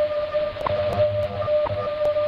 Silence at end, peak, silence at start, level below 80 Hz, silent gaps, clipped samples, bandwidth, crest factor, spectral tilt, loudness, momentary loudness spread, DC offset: 0 s; -10 dBFS; 0 s; -46 dBFS; none; under 0.1%; 6 kHz; 14 dB; -7 dB/octave; -24 LUFS; 3 LU; under 0.1%